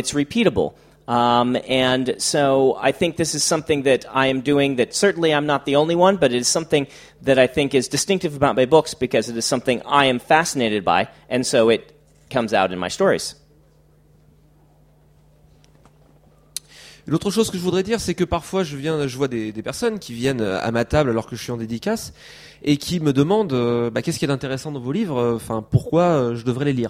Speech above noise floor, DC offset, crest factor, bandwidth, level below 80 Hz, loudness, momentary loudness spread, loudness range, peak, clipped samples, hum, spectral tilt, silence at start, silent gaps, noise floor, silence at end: 35 dB; under 0.1%; 20 dB; 16 kHz; -48 dBFS; -20 LUFS; 9 LU; 6 LU; 0 dBFS; under 0.1%; none; -4.5 dB/octave; 0 s; none; -54 dBFS; 0 s